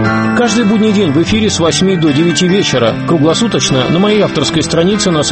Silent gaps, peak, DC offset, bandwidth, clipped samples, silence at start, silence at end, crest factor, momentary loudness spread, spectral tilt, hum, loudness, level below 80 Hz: none; 0 dBFS; under 0.1%; 8.8 kHz; under 0.1%; 0 s; 0 s; 10 dB; 2 LU; -4.5 dB/octave; none; -11 LUFS; -38 dBFS